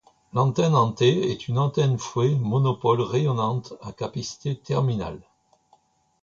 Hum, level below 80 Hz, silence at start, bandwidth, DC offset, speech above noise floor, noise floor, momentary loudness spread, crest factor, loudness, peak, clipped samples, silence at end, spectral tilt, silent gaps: none; -56 dBFS; 0.35 s; 7.6 kHz; under 0.1%; 40 dB; -63 dBFS; 11 LU; 18 dB; -24 LUFS; -6 dBFS; under 0.1%; 1.05 s; -7 dB/octave; none